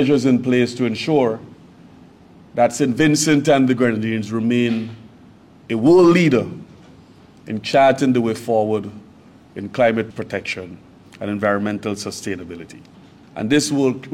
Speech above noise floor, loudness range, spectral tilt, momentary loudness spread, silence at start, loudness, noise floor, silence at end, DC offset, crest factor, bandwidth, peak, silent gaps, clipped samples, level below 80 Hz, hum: 28 dB; 6 LU; -5.5 dB/octave; 17 LU; 0 s; -18 LUFS; -46 dBFS; 0 s; under 0.1%; 14 dB; 15.5 kHz; -4 dBFS; none; under 0.1%; -58 dBFS; none